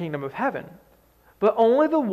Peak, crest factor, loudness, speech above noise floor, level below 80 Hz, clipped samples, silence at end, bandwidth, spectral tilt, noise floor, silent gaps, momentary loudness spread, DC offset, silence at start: -8 dBFS; 16 dB; -22 LUFS; 36 dB; -64 dBFS; under 0.1%; 0 s; 12.5 kHz; -8 dB/octave; -58 dBFS; none; 11 LU; under 0.1%; 0 s